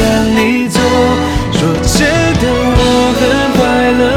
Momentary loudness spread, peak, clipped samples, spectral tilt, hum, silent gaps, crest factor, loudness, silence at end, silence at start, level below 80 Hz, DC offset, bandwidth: 3 LU; 0 dBFS; under 0.1%; -5 dB/octave; none; none; 10 dB; -11 LUFS; 0 s; 0 s; -22 dBFS; under 0.1%; 17.5 kHz